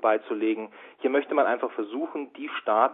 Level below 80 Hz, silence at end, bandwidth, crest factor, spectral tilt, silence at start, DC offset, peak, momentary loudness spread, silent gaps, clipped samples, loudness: -80 dBFS; 0 s; 4 kHz; 20 dB; -8 dB/octave; 0 s; under 0.1%; -6 dBFS; 10 LU; none; under 0.1%; -27 LUFS